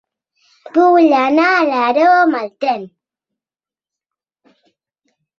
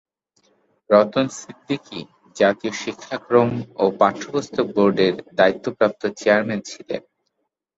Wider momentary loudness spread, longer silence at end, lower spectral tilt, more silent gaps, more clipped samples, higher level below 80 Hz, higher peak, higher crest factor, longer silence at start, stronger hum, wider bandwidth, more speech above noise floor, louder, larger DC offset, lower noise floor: second, 9 LU vs 14 LU; first, 2.5 s vs 0.8 s; about the same, -5 dB/octave vs -5.5 dB/octave; neither; neither; second, -68 dBFS vs -62 dBFS; about the same, -2 dBFS vs -2 dBFS; about the same, 16 dB vs 20 dB; second, 0.75 s vs 0.9 s; neither; second, 6.8 kHz vs 8 kHz; first, over 77 dB vs 55 dB; first, -13 LUFS vs -20 LUFS; neither; first, under -90 dBFS vs -75 dBFS